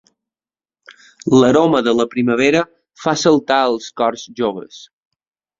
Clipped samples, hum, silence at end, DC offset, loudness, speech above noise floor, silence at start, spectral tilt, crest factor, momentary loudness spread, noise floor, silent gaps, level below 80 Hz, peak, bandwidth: under 0.1%; none; 0.8 s; under 0.1%; -16 LUFS; over 75 dB; 1.25 s; -5 dB/octave; 16 dB; 13 LU; under -90 dBFS; none; -56 dBFS; -2 dBFS; 7.8 kHz